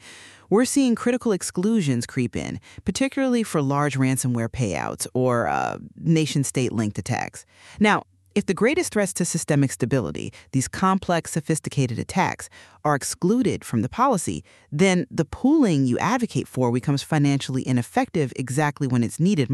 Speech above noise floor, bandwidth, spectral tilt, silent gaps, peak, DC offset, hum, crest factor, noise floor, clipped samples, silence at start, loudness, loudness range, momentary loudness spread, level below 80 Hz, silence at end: 23 dB; 13.5 kHz; -5.5 dB/octave; none; -6 dBFS; under 0.1%; none; 18 dB; -46 dBFS; under 0.1%; 0.05 s; -23 LUFS; 2 LU; 8 LU; -52 dBFS; 0 s